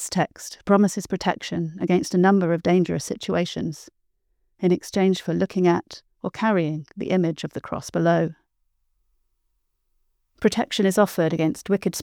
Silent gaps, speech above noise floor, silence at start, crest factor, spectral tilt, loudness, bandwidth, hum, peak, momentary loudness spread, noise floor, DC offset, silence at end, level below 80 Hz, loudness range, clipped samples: none; 50 dB; 0 s; 18 dB; -6 dB/octave; -23 LUFS; 16.5 kHz; none; -4 dBFS; 11 LU; -72 dBFS; under 0.1%; 0 s; -60 dBFS; 5 LU; under 0.1%